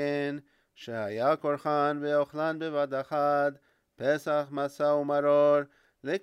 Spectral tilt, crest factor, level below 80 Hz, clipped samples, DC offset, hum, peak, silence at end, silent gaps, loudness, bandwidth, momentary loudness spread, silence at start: -6.5 dB/octave; 16 dB; -78 dBFS; under 0.1%; under 0.1%; none; -14 dBFS; 0.05 s; none; -28 LUFS; 12.5 kHz; 11 LU; 0 s